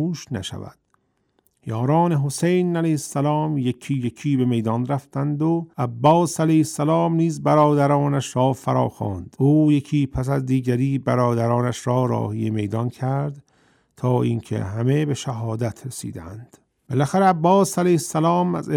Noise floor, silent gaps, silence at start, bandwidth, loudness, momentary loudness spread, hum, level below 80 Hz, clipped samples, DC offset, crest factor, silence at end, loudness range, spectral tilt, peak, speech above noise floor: -67 dBFS; none; 0 s; 16 kHz; -21 LUFS; 11 LU; none; -52 dBFS; under 0.1%; under 0.1%; 18 dB; 0 s; 5 LU; -7 dB/octave; -4 dBFS; 47 dB